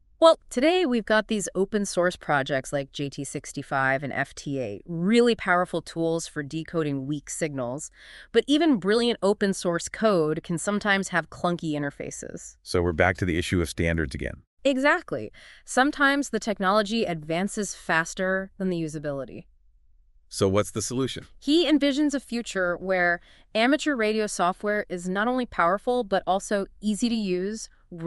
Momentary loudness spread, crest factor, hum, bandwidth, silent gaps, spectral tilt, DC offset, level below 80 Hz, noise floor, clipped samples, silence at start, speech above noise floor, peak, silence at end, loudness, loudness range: 11 LU; 20 dB; none; 12 kHz; 14.47-14.57 s; -4.5 dB/octave; under 0.1%; -50 dBFS; -58 dBFS; under 0.1%; 0.2 s; 33 dB; -4 dBFS; 0 s; -25 LUFS; 3 LU